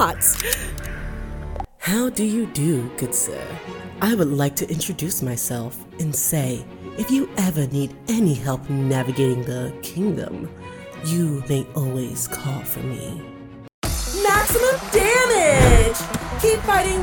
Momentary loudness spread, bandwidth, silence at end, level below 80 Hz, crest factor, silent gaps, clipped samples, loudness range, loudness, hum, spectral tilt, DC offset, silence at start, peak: 16 LU; 19 kHz; 0 s; -32 dBFS; 20 dB; 13.74-13.82 s; under 0.1%; 7 LU; -21 LUFS; none; -4.5 dB/octave; under 0.1%; 0 s; 0 dBFS